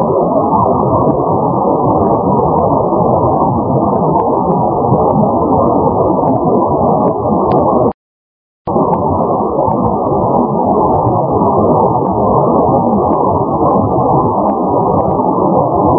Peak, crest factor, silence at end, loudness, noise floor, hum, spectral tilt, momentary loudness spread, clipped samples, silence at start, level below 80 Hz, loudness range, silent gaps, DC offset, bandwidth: 0 dBFS; 12 dB; 0 s; -12 LUFS; under -90 dBFS; none; -16 dB/octave; 2 LU; under 0.1%; 0 s; -32 dBFS; 2 LU; 7.94-8.65 s; under 0.1%; 3.4 kHz